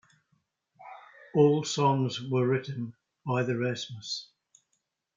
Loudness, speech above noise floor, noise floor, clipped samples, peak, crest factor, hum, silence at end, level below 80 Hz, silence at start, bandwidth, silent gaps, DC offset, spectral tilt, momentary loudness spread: -29 LUFS; 52 dB; -79 dBFS; under 0.1%; -10 dBFS; 20 dB; none; 0.9 s; -76 dBFS; 0.8 s; 7.6 kHz; none; under 0.1%; -6 dB/octave; 21 LU